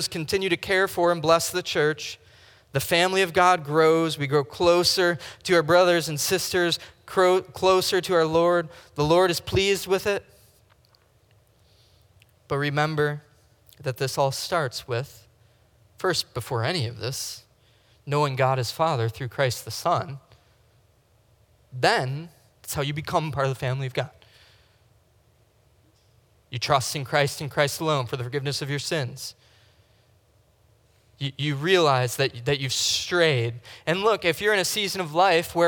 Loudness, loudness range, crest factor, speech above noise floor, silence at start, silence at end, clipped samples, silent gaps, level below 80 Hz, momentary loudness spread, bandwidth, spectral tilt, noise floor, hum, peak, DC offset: -24 LUFS; 9 LU; 20 dB; 38 dB; 0 s; 0 s; under 0.1%; none; -58 dBFS; 12 LU; 19.5 kHz; -4 dB/octave; -61 dBFS; none; -4 dBFS; under 0.1%